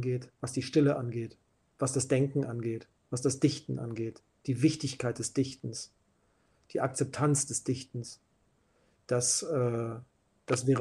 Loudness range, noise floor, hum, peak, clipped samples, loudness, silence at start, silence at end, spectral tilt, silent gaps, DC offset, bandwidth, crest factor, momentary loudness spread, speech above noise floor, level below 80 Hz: 3 LU; -71 dBFS; none; -14 dBFS; under 0.1%; -32 LUFS; 0 s; 0 s; -5 dB/octave; none; under 0.1%; 12.5 kHz; 18 dB; 14 LU; 40 dB; -68 dBFS